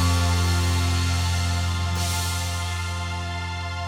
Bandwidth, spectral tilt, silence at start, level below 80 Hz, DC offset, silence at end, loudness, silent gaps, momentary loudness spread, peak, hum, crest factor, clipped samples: 16 kHz; -4 dB/octave; 0 s; -34 dBFS; under 0.1%; 0 s; -24 LUFS; none; 7 LU; -10 dBFS; none; 14 dB; under 0.1%